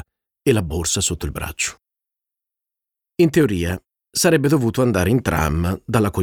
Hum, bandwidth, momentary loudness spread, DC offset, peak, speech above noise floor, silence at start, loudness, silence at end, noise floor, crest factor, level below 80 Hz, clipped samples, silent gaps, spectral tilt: none; 19 kHz; 10 LU; under 0.1%; -4 dBFS; 68 dB; 0.45 s; -19 LUFS; 0 s; -86 dBFS; 16 dB; -36 dBFS; under 0.1%; none; -5 dB/octave